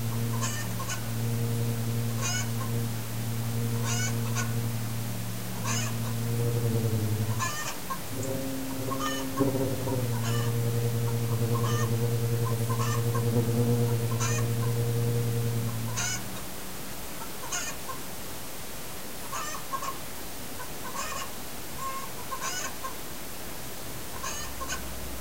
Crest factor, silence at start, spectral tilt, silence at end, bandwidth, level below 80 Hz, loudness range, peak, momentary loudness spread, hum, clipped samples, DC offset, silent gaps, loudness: 18 dB; 0 s; -5 dB/octave; 0 s; 16 kHz; -50 dBFS; 8 LU; -12 dBFS; 10 LU; none; under 0.1%; 1%; none; -31 LUFS